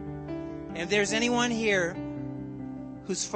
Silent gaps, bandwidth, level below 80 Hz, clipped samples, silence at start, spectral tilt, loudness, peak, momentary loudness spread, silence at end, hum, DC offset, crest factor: none; 8.8 kHz; -54 dBFS; under 0.1%; 0 s; -3.5 dB/octave; -29 LUFS; -12 dBFS; 14 LU; 0 s; none; under 0.1%; 18 dB